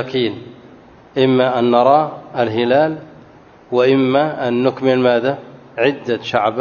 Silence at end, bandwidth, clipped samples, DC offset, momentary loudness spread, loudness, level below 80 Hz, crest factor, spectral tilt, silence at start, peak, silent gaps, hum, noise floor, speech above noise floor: 0 s; 7 kHz; under 0.1%; under 0.1%; 9 LU; -16 LUFS; -60 dBFS; 16 dB; -7.5 dB/octave; 0 s; 0 dBFS; none; none; -44 dBFS; 28 dB